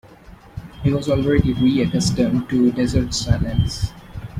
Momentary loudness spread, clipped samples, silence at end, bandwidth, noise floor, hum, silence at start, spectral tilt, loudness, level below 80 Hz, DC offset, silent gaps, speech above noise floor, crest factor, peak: 13 LU; under 0.1%; 0 s; 15 kHz; -44 dBFS; none; 0.1 s; -6 dB/octave; -19 LUFS; -32 dBFS; under 0.1%; none; 25 dB; 18 dB; -2 dBFS